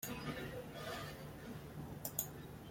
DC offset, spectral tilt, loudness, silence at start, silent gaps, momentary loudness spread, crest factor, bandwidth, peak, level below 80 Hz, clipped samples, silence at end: under 0.1%; -4 dB/octave; -46 LUFS; 0 s; none; 8 LU; 28 dB; 16.5 kHz; -20 dBFS; -62 dBFS; under 0.1%; 0 s